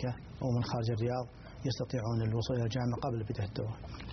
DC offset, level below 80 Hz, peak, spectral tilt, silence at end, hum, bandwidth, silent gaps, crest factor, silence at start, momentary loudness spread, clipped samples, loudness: under 0.1%; -54 dBFS; -22 dBFS; -7 dB/octave; 0 s; none; 6.4 kHz; none; 12 dB; 0 s; 7 LU; under 0.1%; -35 LUFS